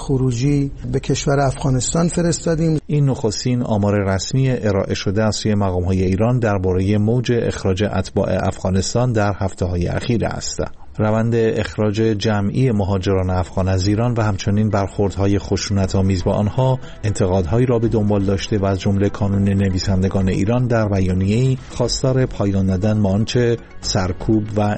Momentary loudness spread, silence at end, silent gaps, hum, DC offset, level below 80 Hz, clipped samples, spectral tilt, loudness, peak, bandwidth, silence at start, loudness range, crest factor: 3 LU; 0 s; none; none; under 0.1%; -36 dBFS; under 0.1%; -6.5 dB/octave; -18 LUFS; -6 dBFS; 8.8 kHz; 0 s; 2 LU; 10 dB